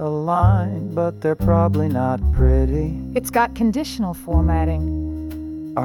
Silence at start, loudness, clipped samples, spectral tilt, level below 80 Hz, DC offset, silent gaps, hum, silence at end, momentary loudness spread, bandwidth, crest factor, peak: 0 s; -20 LUFS; under 0.1%; -7.5 dB/octave; -26 dBFS; under 0.1%; none; none; 0 s; 9 LU; 15.5 kHz; 14 dB; -4 dBFS